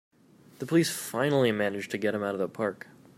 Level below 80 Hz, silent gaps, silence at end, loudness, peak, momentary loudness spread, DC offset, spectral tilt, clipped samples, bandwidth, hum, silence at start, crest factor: -74 dBFS; none; 0.45 s; -28 LUFS; -12 dBFS; 8 LU; under 0.1%; -5 dB/octave; under 0.1%; 16 kHz; none; 0.6 s; 18 dB